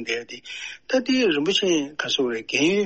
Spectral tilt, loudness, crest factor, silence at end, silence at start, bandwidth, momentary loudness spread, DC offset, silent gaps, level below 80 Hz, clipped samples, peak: -3 dB/octave; -22 LUFS; 16 dB; 0 s; 0 s; 8.4 kHz; 13 LU; 0.1%; none; -64 dBFS; under 0.1%; -8 dBFS